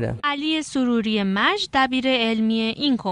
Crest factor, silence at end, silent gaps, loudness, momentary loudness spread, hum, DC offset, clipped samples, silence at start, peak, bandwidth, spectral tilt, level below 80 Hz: 16 dB; 0 s; none; -21 LUFS; 4 LU; none; under 0.1%; under 0.1%; 0 s; -6 dBFS; 10.5 kHz; -4.5 dB/octave; -52 dBFS